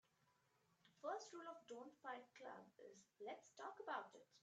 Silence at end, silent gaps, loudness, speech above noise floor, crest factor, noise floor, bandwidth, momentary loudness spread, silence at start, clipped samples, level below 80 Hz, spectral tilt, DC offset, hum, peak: 0.05 s; none; -55 LUFS; 26 dB; 22 dB; -82 dBFS; 8.8 kHz; 11 LU; 0.85 s; under 0.1%; under -90 dBFS; -3 dB/octave; under 0.1%; none; -34 dBFS